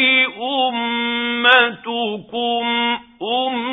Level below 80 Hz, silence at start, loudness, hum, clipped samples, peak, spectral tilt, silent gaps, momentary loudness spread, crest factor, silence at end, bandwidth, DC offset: -64 dBFS; 0 s; -17 LUFS; none; under 0.1%; 0 dBFS; -5.5 dB/octave; none; 11 LU; 18 dB; 0 s; 4 kHz; under 0.1%